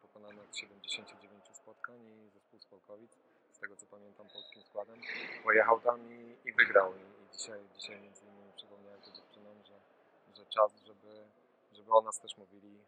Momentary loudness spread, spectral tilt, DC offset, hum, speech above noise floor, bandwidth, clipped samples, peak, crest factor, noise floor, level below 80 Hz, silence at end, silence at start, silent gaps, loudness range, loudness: 28 LU; -1.5 dB/octave; under 0.1%; none; 31 dB; 9.6 kHz; under 0.1%; -10 dBFS; 28 dB; -67 dBFS; under -90 dBFS; 0.55 s; 0.25 s; none; 20 LU; -32 LUFS